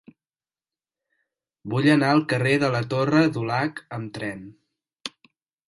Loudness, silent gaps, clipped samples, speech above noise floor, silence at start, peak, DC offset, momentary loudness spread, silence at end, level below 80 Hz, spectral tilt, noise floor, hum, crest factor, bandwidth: -22 LUFS; none; under 0.1%; over 68 dB; 1.65 s; -6 dBFS; under 0.1%; 18 LU; 0.6 s; -64 dBFS; -6.5 dB/octave; under -90 dBFS; none; 20 dB; 11.5 kHz